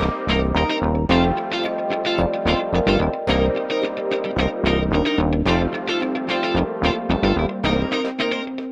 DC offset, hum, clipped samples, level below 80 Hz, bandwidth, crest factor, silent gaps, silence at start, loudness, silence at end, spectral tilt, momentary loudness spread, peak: under 0.1%; none; under 0.1%; -32 dBFS; 9.6 kHz; 16 dB; none; 0 s; -21 LUFS; 0 s; -6.5 dB/octave; 5 LU; -4 dBFS